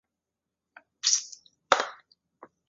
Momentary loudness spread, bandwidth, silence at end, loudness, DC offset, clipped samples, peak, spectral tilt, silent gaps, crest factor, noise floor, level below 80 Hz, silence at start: 19 LU; 8 kHz; 0.25 s; -26 LUFS; under 0.1%; under 0.1%; -2 dBFS; 2 dB/octave; none; 30 dB; -87 dBFS; -74 dBFS; 1.05 s